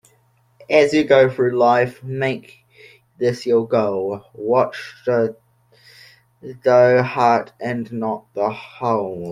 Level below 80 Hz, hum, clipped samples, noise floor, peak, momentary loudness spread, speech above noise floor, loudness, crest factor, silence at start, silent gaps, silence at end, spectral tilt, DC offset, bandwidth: -62 dBFS; none; under 0.1%; -59 dBFS; -2 dBFS; 12 LU; 41 dB; -18 LUFS; 18 dB; 0.7 s; none; 0 s; -6.5 dB/octave; under 0.1%; 12 kHz